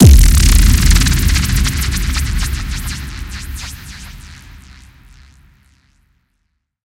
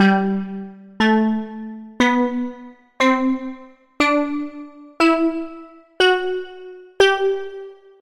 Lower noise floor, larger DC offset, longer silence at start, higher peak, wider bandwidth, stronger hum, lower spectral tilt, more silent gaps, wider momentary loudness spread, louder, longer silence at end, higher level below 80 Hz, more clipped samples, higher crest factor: first, -68 dBFS vs -40 dBFS; neither; about the same, 0 s vs 0 s; about the same, 0 dBFS vs -2 dBFS; first, 17 kHz vs 12 kHz; neither; about the same, -4.5 dB/octave vs -5 dB/octave; neither; about the same, 21 LU vs 21 LU; first, -14 LUFS vs -19 LUFS; first, 2.5 s vs 0.25 s; first, -14 dBFS vs -54 dBFS; first, 0.6% vs under 0.1%; about the same, 14 dB vs 18 dB